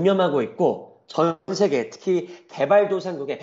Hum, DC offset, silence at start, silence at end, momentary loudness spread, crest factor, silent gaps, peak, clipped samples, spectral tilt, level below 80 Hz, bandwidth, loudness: none; under 0.1%; 0 s; 0 s; 10 LU; 16 dB; none; -6 dBFS; under 0.1%; -6 dB/octave; -70 dBFS; 7.8 kHz; -22 LUFS